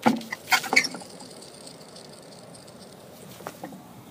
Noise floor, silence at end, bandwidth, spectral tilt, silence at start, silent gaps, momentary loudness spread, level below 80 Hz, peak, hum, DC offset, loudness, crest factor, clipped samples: -46 dBFS; 0 s; 15.5 kHz; -2.5 dB/octave; 0 s; none; 24 LU; -72 dBFS; -2 dBFS; none; under 0.1%; -23 LUFS; 28 dB; under 0.1%